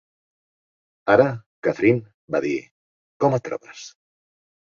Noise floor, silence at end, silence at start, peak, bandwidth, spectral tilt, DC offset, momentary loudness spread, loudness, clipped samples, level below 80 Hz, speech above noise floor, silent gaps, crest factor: under -90 dBFS; 0.9 s; 1.05 s; -2 dBFS; 7.4 kHz; -7 dB/octave; under 0.1%; 17 LU; -22 LUFS; under 0.1%; -62 dBFS; over 70 dB; 1.46-1.62 s, 2.14-2.28 s, 2.71-3.20 s; 22 dB